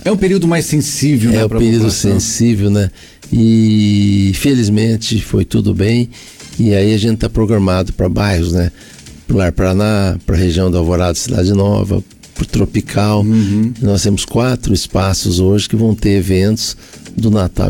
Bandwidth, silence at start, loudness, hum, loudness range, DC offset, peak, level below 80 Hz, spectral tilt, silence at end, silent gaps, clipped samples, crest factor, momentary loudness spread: 18 kHz; 0.05 s; -13 LUFS; none; 2 LU; under 0.1%; -4 dBFS; -28 dBFS; -6 dB/octave; 0 s; none; under 0.1%; 8 dB; 5 LU